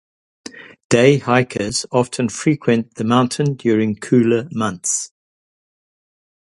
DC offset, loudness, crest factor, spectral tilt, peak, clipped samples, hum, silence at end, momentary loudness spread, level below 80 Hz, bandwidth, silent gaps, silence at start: under 0.1%; -17 LUFS; 18 dB; -5 dB/octave; 0 dBFS; under 0.1%; none; 1.45 s; 9 LU; -54 dBFS; 11.5 kHz; 0.84-0.90 s; 0.55 s